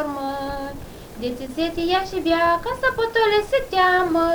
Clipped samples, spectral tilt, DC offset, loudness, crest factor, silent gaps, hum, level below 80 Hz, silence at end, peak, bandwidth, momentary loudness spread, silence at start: under 0.1%; -4.5 dB/octave; under 0.1%; -21 LUFS; 16 dB; none; none; -42 dBFS; 0 s; -6 dBFS; over 20 kHz; 13 LU; 0 s